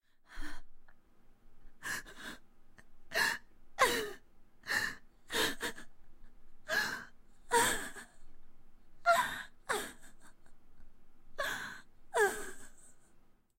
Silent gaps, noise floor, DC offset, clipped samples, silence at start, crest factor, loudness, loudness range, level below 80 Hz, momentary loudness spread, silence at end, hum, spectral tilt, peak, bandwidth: none; -61 dBFS; under 0.1%; under 0.1%; 0.3 s; 24 dB; -35 LUFS; 5 LU; -54 dBFS; 24 LU; 0.25 s; none; -1 dB/octave; -14 dBFS; 16 kHz